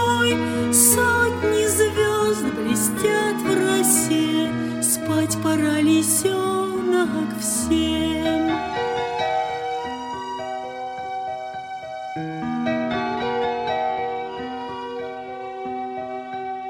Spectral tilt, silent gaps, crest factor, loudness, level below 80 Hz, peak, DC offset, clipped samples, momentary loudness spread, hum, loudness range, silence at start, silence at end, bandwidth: -3.5 dB/octave; none; 20 dB; -21 LUFS; -50 dBFS; -2 dBFS; under 0.1%; under 0.1%; 14 LU; none; 9 LU; 0 s; 0 s; 16.5 kHz